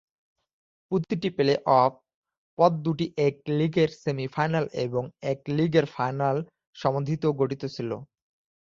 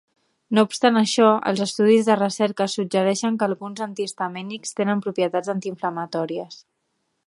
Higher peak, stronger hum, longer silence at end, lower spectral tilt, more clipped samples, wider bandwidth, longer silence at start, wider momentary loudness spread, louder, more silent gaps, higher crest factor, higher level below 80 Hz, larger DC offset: second, -6 dBFS vs -2 dBFS; neither; about the same, 0.6 s vs 0.7 s; first, -7.5 dB/octave vs -4.5 dB/octave; neither; second, 7.4 kHz vs 11.5 kHz; first, 0.9 s vs 0.5 s; second, 9 LU vs 12 LU; second, -26 LUFS vs -22 LUFS; first, 2.14-2.23 s, 2.37-2.57 s, 6.67-6.73 s vs none; about the same, 20 dB vs 20 dB; first, -62 dBFS vs -74 dBFS; neither